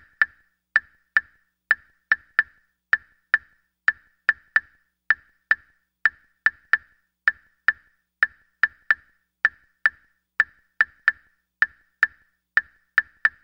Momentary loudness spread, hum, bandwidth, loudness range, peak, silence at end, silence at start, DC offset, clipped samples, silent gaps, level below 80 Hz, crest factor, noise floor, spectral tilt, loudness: 3 LU; none; 7.6 kHz; 1 LU; -2 dBFS; 0.15 s; 0.2 s; under 0.1%; under 0.1%; none; -64 dBFS; 24 dB; -59 dBFS; -1.5 dB/octave; -24 LUFS